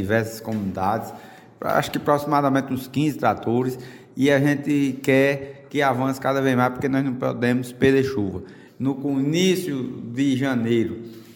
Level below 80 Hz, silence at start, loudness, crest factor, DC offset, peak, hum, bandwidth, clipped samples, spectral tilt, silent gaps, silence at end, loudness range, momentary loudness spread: -56 dBFS; 0 s; -22 LUFS; 18 dB; under 0.1%; -4 dBFS; none; 17 kHz; under 0.1%; -6 dB/octave; none; 0 s; 2 LU; 10 LU